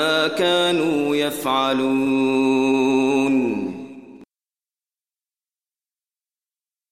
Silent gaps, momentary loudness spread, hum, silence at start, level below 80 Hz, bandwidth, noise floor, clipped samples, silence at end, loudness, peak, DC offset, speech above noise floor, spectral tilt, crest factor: none; 7 LU; none; 0 s; -66 dBFS; 16 kHz; under -90 dBFS; under 0.1%; 2.65 s; -19 LUFS; -8 dBFS; under 0.1%; over 71 dB; -4.5 dB/octave; 14 dB